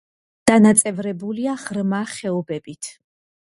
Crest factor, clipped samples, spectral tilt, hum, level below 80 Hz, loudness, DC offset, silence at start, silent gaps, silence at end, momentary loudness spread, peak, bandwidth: 20 dB; under 0.1%; -4.5 dB/octave; none; -58 dBFS; -19 LUFS; under 0.1%; 0.45 s; none; 0.7 s; 18 LU; 0 dBFS; 11.5 kHz